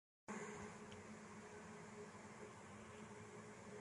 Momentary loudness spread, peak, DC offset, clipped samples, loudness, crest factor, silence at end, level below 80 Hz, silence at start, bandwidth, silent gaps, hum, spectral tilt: 5 LU; -38 dBFS; under 0.1%; under 0.1%; -56 LUFS; 18 dB; 0 s; -78 dBFS; 0.3 s; 11.5 kHz; none; none; -4.5 dB/octave